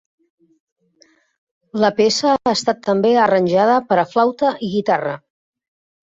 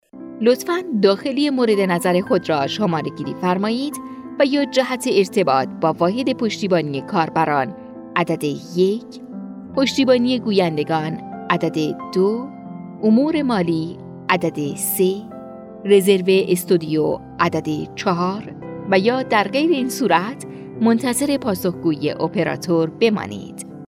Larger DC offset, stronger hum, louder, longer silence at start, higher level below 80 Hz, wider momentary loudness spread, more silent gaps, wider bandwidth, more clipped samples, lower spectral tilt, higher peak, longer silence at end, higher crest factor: neither; neither; about the same, -17 LUFS vs -19 LUFS; first, 1.75 s vs 0.15 s; about the same, -60 dBFS vs -60 dBFS; second, 6 LU vs 13 LU; neither; second, 8.2 kHz vs 16.5 kHz; neither; about the same, -4.5 dB/octave vs -5.5 dB/octave; about the same, -2 dBFS vs -2 dBFS; first, 0.85 s vs 0.1 s; about the same, 16 dB vs 18 dB